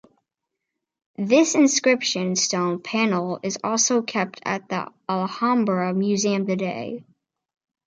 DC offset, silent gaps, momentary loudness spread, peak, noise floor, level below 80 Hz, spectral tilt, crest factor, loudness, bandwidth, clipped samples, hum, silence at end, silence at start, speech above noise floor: under 0.1%; none; 11 LU; -6 dBFS; -83 dBFS; -72 dBFS; -3.5 dB/octave; 18 dB; -22 LUFS; 9.6 kHz; under 0.1%; none; 0.85 s; 1.2 s; 61 dB